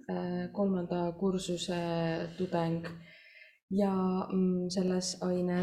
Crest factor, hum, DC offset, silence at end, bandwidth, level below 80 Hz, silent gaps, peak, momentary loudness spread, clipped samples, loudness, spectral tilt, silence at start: 16 dB; none; under 0.1%; 0 s; 11 kHz; -64 dBFS; 3.63-3.68 s; -18 dBFS; 6 LU; under 0.1%; -33 LUFS; -6 dB/octave; 0.1 s